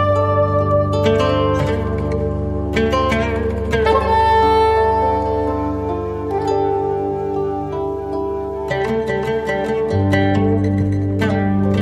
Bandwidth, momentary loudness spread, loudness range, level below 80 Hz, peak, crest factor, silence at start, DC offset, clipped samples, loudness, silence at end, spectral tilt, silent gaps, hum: 10.5 kHz; 8 LU; 5 LU; -30 dBFS; -4 dBFS; 14 dB; 0 s; under 0.1%; under 0.1%; -18 LUFS; 0 s; -7.5 dB/octave; none; none